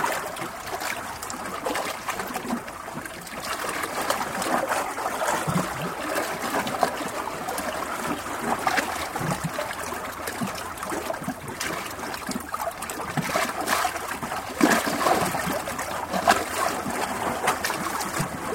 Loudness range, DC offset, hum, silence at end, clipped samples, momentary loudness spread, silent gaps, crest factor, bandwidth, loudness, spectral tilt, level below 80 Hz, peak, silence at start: 6 LU; under 0.1%; none; 0 s; under 0.1%; 9 LU; none; 26 dB; 16.5 kHz; -27 LUFS; -3.5 dB/octave; -52 dBFS; -2 dBFS; 0 s